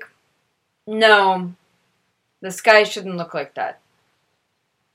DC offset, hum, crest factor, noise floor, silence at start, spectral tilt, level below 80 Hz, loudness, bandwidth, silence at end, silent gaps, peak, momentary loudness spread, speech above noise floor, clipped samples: under 0.1%; none; 22 dB; -71 dBFS; 0 s; -3.5 dB/octave; -74 dBFS; -17 LUFS; 16 kHz; 1.25 s; none; 0 dBFS; 18 LU; 53 dB; under 0.1%